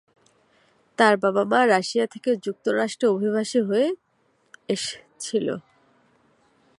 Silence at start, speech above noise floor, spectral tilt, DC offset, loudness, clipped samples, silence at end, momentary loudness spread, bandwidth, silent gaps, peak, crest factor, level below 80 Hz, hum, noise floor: 1 s; 44 dB; -4.5 dB/octave; under 0.1%; -23 LUFS; under 0.1%; 1.2 s; 12 LU; 11.5 kHz; none; -4 dBFS; 22 dB; -74 dBFS; none; -66 dBFS